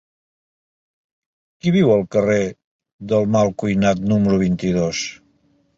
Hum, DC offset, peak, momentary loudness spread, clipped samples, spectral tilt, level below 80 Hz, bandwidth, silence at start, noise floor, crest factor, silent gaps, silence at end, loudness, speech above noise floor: none; under 0.1%; -4 dBFS; 9 LU; under 0.1%; -6.5 dB/octave; -48 dBFS; 7.6 kHz; 1.65 s; -60 dBFS; 16 dB; 2.64-2.79 s, 2.93-2.99 s; 0.65 s; -18 LUFS; 43 dB